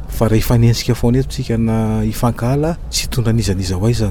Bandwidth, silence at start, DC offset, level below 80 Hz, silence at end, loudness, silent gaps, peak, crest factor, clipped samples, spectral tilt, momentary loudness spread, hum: 19 kHz; 0 s; under 0.1%; -26 dBFS; 0 s; -16 LUFS; none; -2 dBFS; 14 dB; under 0.1%; -6 dB/octave; 5 LU; none